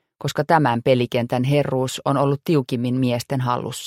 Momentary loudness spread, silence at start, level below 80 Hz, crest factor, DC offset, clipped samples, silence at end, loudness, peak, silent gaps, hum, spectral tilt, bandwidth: 5 LU; 0.2 s; -58 dBFS; 18 dB; under 0.1%; under 0.1%; 0 s; -21 LUFS; -2 dBFS; none; none; -6.5 dB/octave; 16 kHz